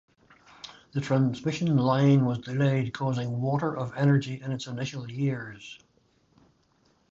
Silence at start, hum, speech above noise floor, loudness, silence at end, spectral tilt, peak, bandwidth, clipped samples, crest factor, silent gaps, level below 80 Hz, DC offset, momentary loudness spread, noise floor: 0.65 s; none; 40 dB; -27 LUFS; 1.35 s; -7.5 dB/octave; -10 dBFS; 7.6 kHz; under 0.1%; 16 dB; none; -64 dBFS; under 0.1%; 17 LU; -66 dBFS